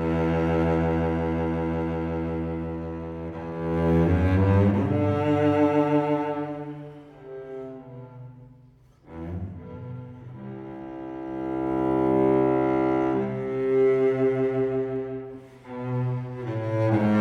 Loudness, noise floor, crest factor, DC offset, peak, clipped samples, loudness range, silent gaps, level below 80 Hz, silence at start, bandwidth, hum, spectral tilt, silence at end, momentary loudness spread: -25 LUFS; -54 dBFS; 16 dB; under 0.1%; -10 dBFS; under 0.1%; 17 LU; none; -44 dBFS; 0 s; 6.8 kHz; none; -9.5 dB/octave; 0 s; 19 LU